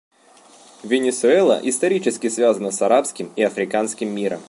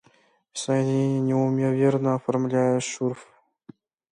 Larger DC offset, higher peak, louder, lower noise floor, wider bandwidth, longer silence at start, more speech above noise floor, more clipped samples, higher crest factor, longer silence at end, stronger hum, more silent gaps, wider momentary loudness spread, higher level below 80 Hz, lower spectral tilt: neither; first, -4 dBFS vs -10 dBFS; first, -19 LUFS vs -24 LUFS; second, -50 dBFS vs -61 dBFS; about the same, 11.5 kHz vs 10.5 kHz; first, 0.85 s vs 0.55 s; second, 31 dB vs 38 dB; neither; about the same, 16 dB vs 16 dB; second, 0.05 s vs 0.9 s; neither; neither; about the same, 8 LU vs 9 LU; about the same, -72 dBFS vs -70 dBFS; second, -4 dB/octave vs -6.5 dB/octave